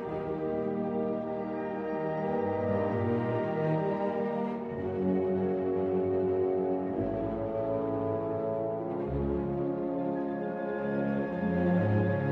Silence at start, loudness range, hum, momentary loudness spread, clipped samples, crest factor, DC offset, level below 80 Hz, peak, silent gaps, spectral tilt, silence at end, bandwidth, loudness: 0 s; 2 LU; none; 5 LU; under 0.1%; 14 dB; under 0.1%; -52 dBFS; -16 dBFS; none; -10.5 dB/octave; 0 s; 5.6 kHz; -31 LUFS